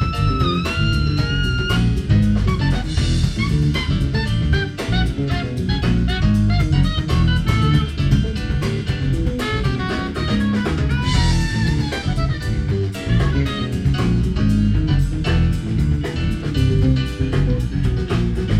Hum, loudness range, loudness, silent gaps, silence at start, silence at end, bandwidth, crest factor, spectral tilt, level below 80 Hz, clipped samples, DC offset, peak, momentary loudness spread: none; 2 LU; -19 LUFS; none; 0 s; 0 s; 13 kHz; 14 dB; -6.5 dB/octave; -24 dBFS; under 0.1%; 0.1%; -4 dBFS; 5 LU